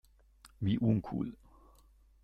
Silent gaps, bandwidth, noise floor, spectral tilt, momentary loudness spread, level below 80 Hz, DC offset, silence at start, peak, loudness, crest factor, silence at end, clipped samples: none; 10 kHz; -63 dBFS; -9 dB/octave; 9 LU; -58 dBFS; under 0.1%; 0.45 s; -18 dBFS; -34 LUFS; 18 dB; 0.9 s; under 0.1%